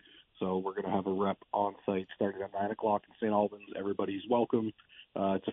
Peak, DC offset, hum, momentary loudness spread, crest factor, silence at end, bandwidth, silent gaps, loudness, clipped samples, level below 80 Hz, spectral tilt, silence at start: -14 dBFS; under 0.1%; none; 6 LU; 18 dB; 0 s; 3.9 kHz; none; -33 LUFS; under 0.1%; -74 dBFS; -5.5 dB/octave; 0.4 s